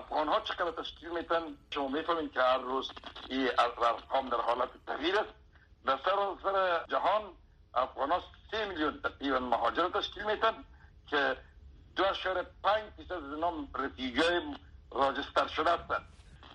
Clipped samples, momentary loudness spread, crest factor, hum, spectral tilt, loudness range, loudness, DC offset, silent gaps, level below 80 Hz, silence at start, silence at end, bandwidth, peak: under 0.1%; 10 LU; 20 dB; none; -4.5 dB/octave; 2 LU; -32 LUFS; under 0.1%; none; -58 dBFS; 0 s; 0 s; 10 kHz; -14 dBFS